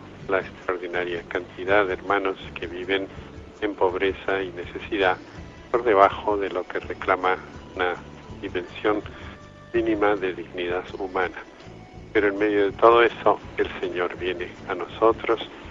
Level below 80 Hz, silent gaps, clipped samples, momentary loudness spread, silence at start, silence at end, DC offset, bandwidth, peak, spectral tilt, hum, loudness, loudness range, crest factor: -50 dBFS; none; under 0.1%; 18 LU; 0 s; 0 s; under 0.1%; 7.6 kHz; -2 dBFS; -6 dB/octave; none; -24 LUFS; 5 LU; 22 dB